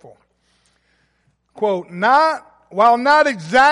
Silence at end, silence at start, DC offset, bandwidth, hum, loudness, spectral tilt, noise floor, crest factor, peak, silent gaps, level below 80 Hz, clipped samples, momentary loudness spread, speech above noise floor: 0 s; 1.55 s; under 0.1%; 11.5 kHz; none; -15 LUFS; -4 dB/octave; -64 dBFS; 16 dB; -2 dBFS; none; -58 dBFS; under 0.1%; 10 LU; 49 dB